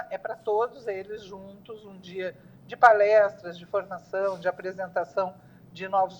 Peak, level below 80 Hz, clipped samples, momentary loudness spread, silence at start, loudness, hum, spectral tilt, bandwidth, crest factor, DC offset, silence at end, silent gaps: -4 dBFS; -70 dBFS; under 0.1%; 24 LU; 0 s; -26 LUFS; none; -5.5 dB/octave; 19 kHz; 22 dB; under 0.1%; 0 s; none